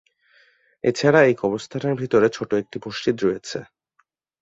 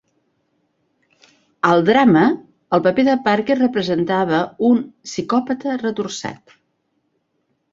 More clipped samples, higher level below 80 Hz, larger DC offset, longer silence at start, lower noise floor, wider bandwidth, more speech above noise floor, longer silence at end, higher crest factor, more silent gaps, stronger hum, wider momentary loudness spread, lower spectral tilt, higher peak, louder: neither; about the same, -60 dBFS vs -60 dBFS; neither; second, 0.85 s vs 1.65 s; about the same, -68 dBFS vs -69 dBFS; about the same, 8 kHz vs 7.6 kHz; second, 47 dB vs 52 dB; second, 0.8 s vs 1.4 s; about the same, 20 dB vs 18 dB; neither; neither; about the same, 14 LU vs 13 LU; about the same, -6 dB/octave vs -6 dB/octave; about the same, -2 dBFS vs -2 dBFS; second, -21 LUFS vs -17 LUFS